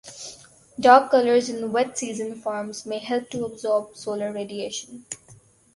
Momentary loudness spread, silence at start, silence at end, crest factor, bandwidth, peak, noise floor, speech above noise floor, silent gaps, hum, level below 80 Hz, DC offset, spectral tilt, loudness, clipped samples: 22 LU; 0.05 s; 0.4 s; 22 dB; 11.5 kHz; -2 dBFS; -53 dBFS; 30 dB; none; none; -66 dBFS; under 0.1%; -3.5 dB/octave; -23 LUFS; under 0.1%